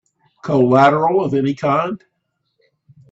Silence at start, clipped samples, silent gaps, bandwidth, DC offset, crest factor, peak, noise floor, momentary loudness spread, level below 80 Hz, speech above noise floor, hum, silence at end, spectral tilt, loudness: 0.45 s; under 0.1%; none; 7.8 kHz; under 0.1%; 18 dB; 0 dBFS; -72 dBFS; 15 LU; -58 dBFS; 57 dB; none; 1.15 s; -8 dB/octave; -16 LUFS